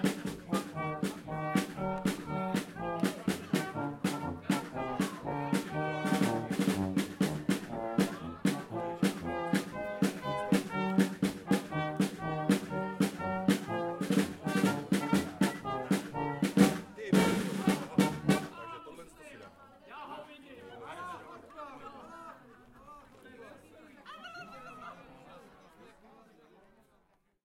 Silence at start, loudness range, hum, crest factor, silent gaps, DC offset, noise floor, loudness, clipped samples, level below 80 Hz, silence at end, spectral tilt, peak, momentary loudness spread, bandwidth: 0 s; 19 LU; none; 22 dB; none; under 0.1%; -71 dBFS; -33 LUFS; under 0.1%; -64 dBFS; 1.25 s; -5.5 dB/octave; -10 dBFS; 20 LU; 16.5 kHz